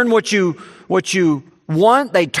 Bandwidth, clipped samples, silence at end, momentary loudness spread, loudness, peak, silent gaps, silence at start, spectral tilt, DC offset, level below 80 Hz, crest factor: 14 kHz; under 0.1%; 0 s; 10 LU; -16 LUFS; 0 dBFS; none; 0 s; -5 dB/octave; under 0.1%; -64 dBFS; 16 dB